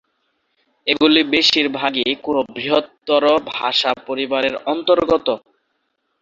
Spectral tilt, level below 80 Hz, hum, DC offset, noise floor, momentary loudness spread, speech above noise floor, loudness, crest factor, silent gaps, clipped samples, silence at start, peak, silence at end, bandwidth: -3.5 dB/octave; -56 dBFS; none; under 0.1%; -70 dBFS; 8 LU; 53 dB; -17 LUFS; 18 dB; none; under 0.1%; 0.85 s; 0 dBFS; 0.85 s; 7.6 kHz